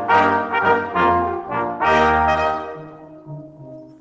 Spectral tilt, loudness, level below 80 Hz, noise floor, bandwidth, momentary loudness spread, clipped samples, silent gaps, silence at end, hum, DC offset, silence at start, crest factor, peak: -6 dB/octave; -18 LUFS; -42 dBFS; -39 dBFS; 8 kHz; 22 LU; under 0.1%; none; 0.1 s; none; under 0.1%; 0 s; 16 dB; -4 dBFS